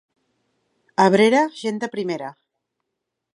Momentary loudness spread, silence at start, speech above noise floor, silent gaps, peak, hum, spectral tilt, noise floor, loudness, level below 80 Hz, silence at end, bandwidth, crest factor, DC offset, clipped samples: 14 LU; 1 s; 62 dB; none; -2 dBFS; none; -5.5 dB/octave; -81 dBFS; -20 LUFS; -74 dBFS; 1.05 s; 11 kHz; 20 dB; under 0.1%; under 0.1%